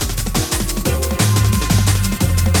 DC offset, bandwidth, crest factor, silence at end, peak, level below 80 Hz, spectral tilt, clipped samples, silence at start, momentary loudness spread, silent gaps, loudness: under 0.1%; over 20 kHz; 14 dB; 0 s; -2 dBFS; -22 dBFS; -4.5 dB/octave; under 0.1%; 0 s; 4 LU; none; -17 LUFS